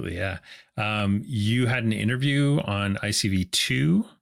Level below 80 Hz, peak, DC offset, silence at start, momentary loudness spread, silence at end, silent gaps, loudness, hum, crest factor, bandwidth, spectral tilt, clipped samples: -52 dBFS; -12 dBFS; under 0.1%; 0 s; 8 LU; 0.15 s; none; -24 LUFS; none; 12 dB; 16.5 kHz; -5 dB/octave; under 0.1%